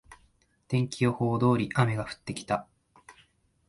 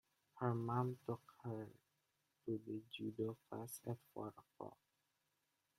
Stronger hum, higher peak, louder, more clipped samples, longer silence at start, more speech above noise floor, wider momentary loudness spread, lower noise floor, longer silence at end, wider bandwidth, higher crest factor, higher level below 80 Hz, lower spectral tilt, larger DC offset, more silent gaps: neither; first, -8 dBFS vs -26 dBFS; first, -28 LUFS vs -47 LUFS; neither; second, 0.1 s vs 0.35 s; about the same, 39 dB vs 40 dB; second, 9 LU vs 15 LU; second, -66 dBFS vs -86 dBFS; second, 0.55 s vs 1.05 s; second, 11.5 kHz vs 15.5 kHz; about the same, 22 dB vs 22 dB; first, -60 dBFS vs -82 dBFS; about the same, -6.5 dB/octave vs -7 dB/octave; neither; neither